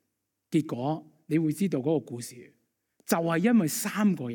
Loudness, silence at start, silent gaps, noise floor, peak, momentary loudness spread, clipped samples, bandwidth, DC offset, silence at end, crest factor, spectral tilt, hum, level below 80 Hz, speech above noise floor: -28 LUFS; 0.5 s; none; -81 dBFS; -10 dBFS; 15 LU; under 0.1%; 17.5 kHz; under 0.1%; 0 s; 18 dB; -6 dB/octave; none; -74 dBFS; 54 dB